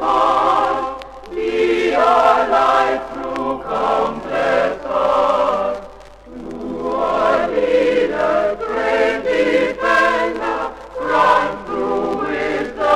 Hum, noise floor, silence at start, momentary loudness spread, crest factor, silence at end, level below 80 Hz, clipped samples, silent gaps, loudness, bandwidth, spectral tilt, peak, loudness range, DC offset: none; -38 dBFS; 0 s; 11 LU; 16 dB; 0 s; -46 dBFS; under 0.1%; none; -17 LUFS; 12 kHz; -4.5 dB/octave; 0 dBFS; 3 LU; under 0.1%